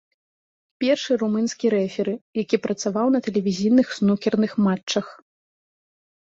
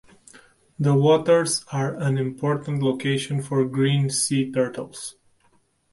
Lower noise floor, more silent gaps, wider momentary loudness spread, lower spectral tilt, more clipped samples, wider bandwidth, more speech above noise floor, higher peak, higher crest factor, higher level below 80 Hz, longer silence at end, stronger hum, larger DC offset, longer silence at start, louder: first, under -90 dBFS vs -63 dBFS; first, 2.21-2.33 s, 4.83-4.87 s vs none; about the same, 7 LU vs 9 LU; about the same, -5.5 dB/octave vs -5.5 dB/octave; neither; second, 7.8 kHz vs 11.5 kHz; first, over 69 dB vs 41 dB; about the same, -6 dBFS vs -6 dBFS; about the same, 16 dB vs 16 dB; about the same, -64 dBFS vs -62 dBFS; first, 1.15 s vs 0.8 s; neither; neither; about the same, 0.8 s vs 0.8 s; about the same, -22 LUFS vs -22 LUFS